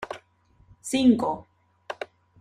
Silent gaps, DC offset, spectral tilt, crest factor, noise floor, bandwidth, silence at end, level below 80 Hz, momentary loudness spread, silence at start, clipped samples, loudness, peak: none; under 0.1%; -4.5 dB/octave; 20 dB; -61 dBFS; 14 kHz; 0.35 s; -60 dBFS; 20 LU; 0 s; under 0.1%; -23 LUFS; -8 dBFS